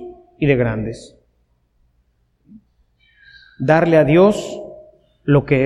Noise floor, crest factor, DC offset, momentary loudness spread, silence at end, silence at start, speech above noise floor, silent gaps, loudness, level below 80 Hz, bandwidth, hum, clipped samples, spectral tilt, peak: -62 dBFS; 18 dB; under 0.1%; 21 LU; 0 s; 0 s; 48 dB; none; -16 LUFS; -44 dBFS; 11.5 kHz; 60 Hz at -55 dBFS; under 0.1%; -7.5 dB/octave; -2 dBFS